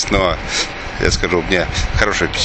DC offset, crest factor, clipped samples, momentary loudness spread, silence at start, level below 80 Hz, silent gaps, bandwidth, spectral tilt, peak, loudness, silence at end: under 0.1%; 18 dB; under 0.1%; 4 LU; 0 s; -26 dBFS; none; 9 kHz; -3.5 dB/octave; 0 dBFS; -17 LUFS; 0 s